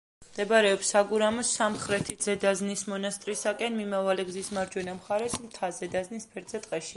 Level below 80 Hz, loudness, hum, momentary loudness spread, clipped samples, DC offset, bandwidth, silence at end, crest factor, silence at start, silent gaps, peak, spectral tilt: -62 dBFS; -29 LUFS; none; 11 LU; under 0.1%; under 0.1%; 11.5 kHz; 0 s; 20 dB; 0.2 s; none; -10 dBFS; -3 dB/octave